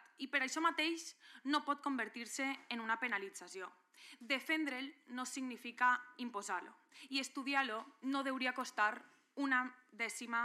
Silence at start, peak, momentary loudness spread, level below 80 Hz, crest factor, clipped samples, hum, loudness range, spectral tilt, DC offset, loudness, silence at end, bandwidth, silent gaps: 0.2 s; -20 dBFS; 14 LU; under -90 dBFS; 20 dB; under 0.1%; none; 2 LU; -1 dB/octave; under 0.1%; -39 LUFS; 0 s; 14.5 kHz; none